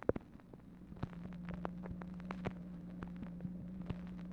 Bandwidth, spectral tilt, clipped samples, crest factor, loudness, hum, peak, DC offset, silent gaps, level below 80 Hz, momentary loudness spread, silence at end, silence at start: 6.8 kHz; -9 dB/octave; under 0.1%; 30 dB; -47 LUFS; none; -16 dBFS; under 0.1%; none; -58 dBFS; 11 LU; 0 s; 0 s